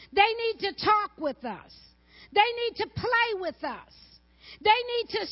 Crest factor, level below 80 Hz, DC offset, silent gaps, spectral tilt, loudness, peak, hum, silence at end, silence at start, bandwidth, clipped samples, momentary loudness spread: 22 dB; -58 dBFS; under 0.1%; none; -7 dB/octave; -26 LUFS; -6 dBFS; none; 0 s; 0 s; 5.8 kHz; under 0.1%; 13 LU